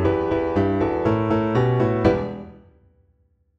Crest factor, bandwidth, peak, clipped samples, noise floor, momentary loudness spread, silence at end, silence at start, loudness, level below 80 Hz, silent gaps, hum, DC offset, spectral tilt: 16 dB; 7.4 kHz; -4 dBFS; under 0.1%; -63 dBFS; 5 LU; 1 s; 0 s; -21 LUFS; -42 dBFS; none; none; under 0.1%; -9 dB/octave